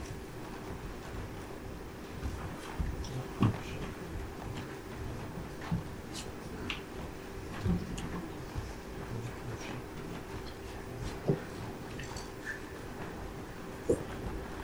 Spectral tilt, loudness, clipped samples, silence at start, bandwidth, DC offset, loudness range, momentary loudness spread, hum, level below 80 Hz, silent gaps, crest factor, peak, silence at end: -6 dB/octave; -40 LUFS; under 0.1%; 0 s; over 20 kHz; under 0.1%; 3 LU; 9 LU; none; -48 dBFS; none; 24 dB; -16 dBFS; 0 s